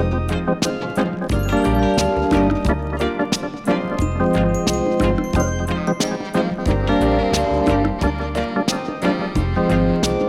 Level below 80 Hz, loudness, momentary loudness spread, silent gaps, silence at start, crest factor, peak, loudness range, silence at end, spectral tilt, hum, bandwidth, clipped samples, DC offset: -28 dBFS; -20 LUFS; 5 LU; none; 0 s; 12 dB; -6 dBFS; 1 LU; 0 s; -6 dB/octave; none; 16 kHz; under 0.1%; under 0.1%